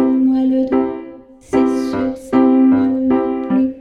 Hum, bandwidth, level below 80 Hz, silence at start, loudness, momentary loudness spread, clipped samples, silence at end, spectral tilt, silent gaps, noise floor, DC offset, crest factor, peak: none; 6.8 kHz; -48 dBFS; 0 s; -15 LUFS; 8 LU; under 0.1%; 0 s; -7.5 dB/octave; none; -37 dBFS; under 0.1%; 14 dB; -2 dBFS